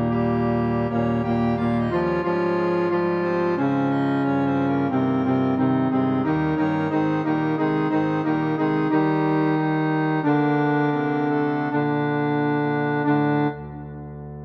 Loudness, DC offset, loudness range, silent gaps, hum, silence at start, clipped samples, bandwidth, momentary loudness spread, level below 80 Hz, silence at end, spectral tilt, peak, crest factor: -22 LUFS; under 0.1%; 1 LU; none; none; 0 s; under 0.1%; 6 kHz; 2 LU; -50 dBFS; 0 s; -9.5 dB/octave; -10 dBFS; 12 dB